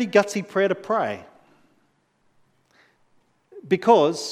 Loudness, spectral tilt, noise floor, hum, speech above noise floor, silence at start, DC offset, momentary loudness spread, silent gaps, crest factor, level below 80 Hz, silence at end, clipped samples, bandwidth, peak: -21 LUFS; -5 dB/octave; -66 dBFS; none; 45 dB; 0 s; under 0.1%; 10 LU; none; 22 dB; -76 dBFS; 0 s; under 0.1%; 14 kHz; -2 dBFS